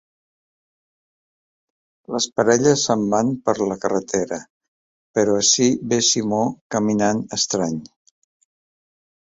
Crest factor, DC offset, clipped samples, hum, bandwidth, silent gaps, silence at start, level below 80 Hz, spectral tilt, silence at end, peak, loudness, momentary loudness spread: 20 dB; under 0.1%; under 0.1%; none; 8 kHz; 4.50-4.61 s, 4.68-5.14 s, 6.61-6.70 s; 2.1 s; -58 dBFS; -3.5 dB/octave; 1.4 s; -2 dBFS; -19 LUFS; 9 LU